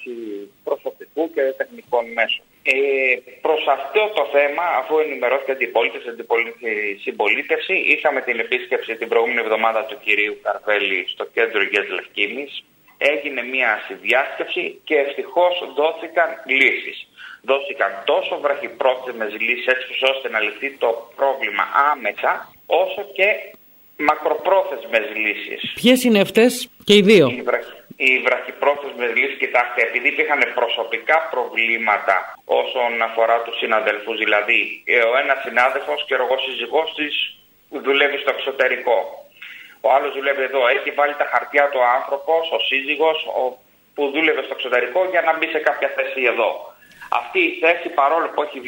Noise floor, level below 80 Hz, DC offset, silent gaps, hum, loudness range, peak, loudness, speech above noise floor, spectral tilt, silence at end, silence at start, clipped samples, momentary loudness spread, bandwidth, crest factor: -40 dBFS; -68 dBFS; under 0.1%; none; none; 4 LU; -2 dBFS; -19 LUFS; 20 dB; -4 dB/octave; 0 s; 0 s; under 0.1%; 8 LU; 16.5 kHz; 18 dB